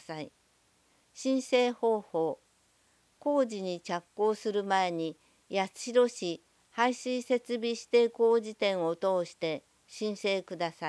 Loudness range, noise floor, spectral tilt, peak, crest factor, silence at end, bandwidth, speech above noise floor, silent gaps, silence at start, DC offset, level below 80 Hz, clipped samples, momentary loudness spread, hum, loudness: 3 LU; -69 dBFS; -4.5 dB/octave; -12 dBFS; 18 dB; 0 s; 11 kHz; 39 dB; none; 0.1 s; under 0.1%; -82 dBFS; under 0.1%; 11 LU; 60 Hz at -70 dBFS; -31 LUFS